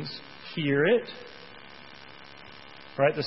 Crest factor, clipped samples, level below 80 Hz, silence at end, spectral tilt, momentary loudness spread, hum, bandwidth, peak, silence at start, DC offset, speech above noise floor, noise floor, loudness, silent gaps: 20 dB; under 0.1%; -68 dBFS; 0 s; -8 dB/octave; 22 LU; none; 6 kHz; -10 dBFS; 0 s; 0.2%; 22 dB; -48 dBFS; -27 LUFS; none